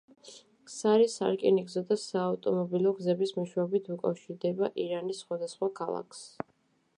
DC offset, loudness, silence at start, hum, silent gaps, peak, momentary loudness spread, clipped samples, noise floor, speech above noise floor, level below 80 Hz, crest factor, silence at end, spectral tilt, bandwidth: under 0.1%; -30 LUFS; 0.25 s; none; none; -12 dBFS; 17 LU; under 0.1%; -71 dBFS; 41 dB; -80 dBFS; 18 dB; 0.7 s; -6 dB/octave; 11 kHz